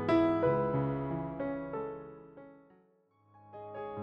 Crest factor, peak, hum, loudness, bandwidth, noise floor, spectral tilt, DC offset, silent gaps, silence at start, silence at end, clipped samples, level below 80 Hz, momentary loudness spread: 18 dB; -16 dBFS; none; -33 LUFS; 5.8 kHz; -68 dBFS; -9.5 dB/octave; under 0.1%; none; 0 s; 0 s; under 0.1%; -60 dBFS; 24 LU